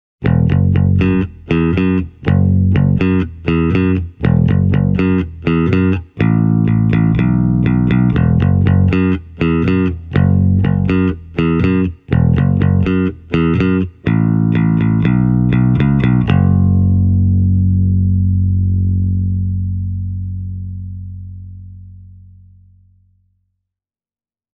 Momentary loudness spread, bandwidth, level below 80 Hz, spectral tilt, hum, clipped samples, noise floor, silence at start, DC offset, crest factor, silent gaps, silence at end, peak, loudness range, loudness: 6 LU; 4.8 kHz; -30 dBFS; -10.5 dB/octave; none; under 0.1%; under -90 dBFS; 0.2 s; under 0.1%; 12 dB; none; 2.5 s; -2 dBFS; 7 LU; -14 LUFS